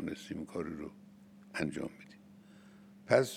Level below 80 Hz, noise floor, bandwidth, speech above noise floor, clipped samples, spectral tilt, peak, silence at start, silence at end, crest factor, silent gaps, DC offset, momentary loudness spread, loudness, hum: -70 dBFS; -57 dBFS; 16 kHz; 22 dB; under 0.1%; -5.5 dB/octave; -12 dBFS; 0 s; 0 s; 26 dB; none; under 0.1%; 24 LU; -38 LUFS; none